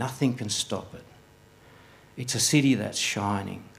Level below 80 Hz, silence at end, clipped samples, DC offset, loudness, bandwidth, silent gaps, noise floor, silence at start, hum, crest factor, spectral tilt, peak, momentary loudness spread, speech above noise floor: -64 dBFS; 0.1 s; under 0.1%; under 0.1%; -26 LUFS; 16 kHz; none; -55 dBFS; 0 s; none; 20 dB; -3.5 dB/octave; -8 dBFS; 15 LU; 28 dB